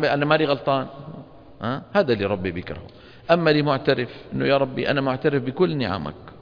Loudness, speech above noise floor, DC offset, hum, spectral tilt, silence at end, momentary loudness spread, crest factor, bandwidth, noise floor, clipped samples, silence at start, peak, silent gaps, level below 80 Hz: -22 LUFS; 19 dB; under 0.1%; none; -8 dB/octave; 0.05 s; 16 LU; 20 dB; 5.2 kHz; -41 dBFS; under 0.1%; 0 s; -2 dBFS; none; -52 dBFS